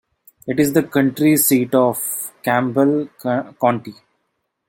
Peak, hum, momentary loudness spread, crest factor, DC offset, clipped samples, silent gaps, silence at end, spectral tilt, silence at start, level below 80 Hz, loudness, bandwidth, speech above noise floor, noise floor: -2 dBFS; none; 9 LU; 16 dB; under 0.1%; under 0.1%; none; 0.75 s; -5 dB/octave; 0.45 s; -60 dBFS; -18 LUFS; 17 kHz; 55 dB; -72 dBFS